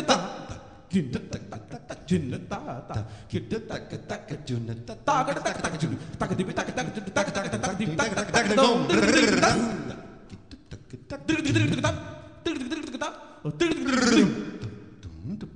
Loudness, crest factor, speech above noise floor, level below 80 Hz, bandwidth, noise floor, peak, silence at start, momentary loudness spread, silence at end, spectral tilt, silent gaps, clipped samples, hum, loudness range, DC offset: -26 LUFS; 20 dB; 20 dB; -50 dBFS; 10 kHz; -46 dBFS; -6 dBFS; 0 s; 20 LU; 0 s; -4.5 dB/octave; none; under 0.1%; none; 9 LU; 0.1%